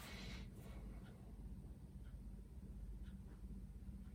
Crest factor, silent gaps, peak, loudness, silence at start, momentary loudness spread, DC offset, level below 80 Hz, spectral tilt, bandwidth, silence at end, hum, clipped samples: 12 dB; none; -42 dBFS; -56 LUFS; 0 s; 4 LU; under 0.1%; -56 dBFS; -6 dB/octave; 16.5 kHz; 0 s; none; under 0.1%